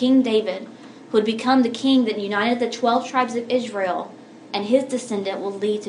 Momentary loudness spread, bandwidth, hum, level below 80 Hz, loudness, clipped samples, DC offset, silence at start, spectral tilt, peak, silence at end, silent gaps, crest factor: 11 LU; 11 kHz; none; -76 dBFS; -21 LUFS; under 0.1%; under 0.1%; 0 s; -4.5 dB/octave; -4 dBFS; 0 s; none; 18 dB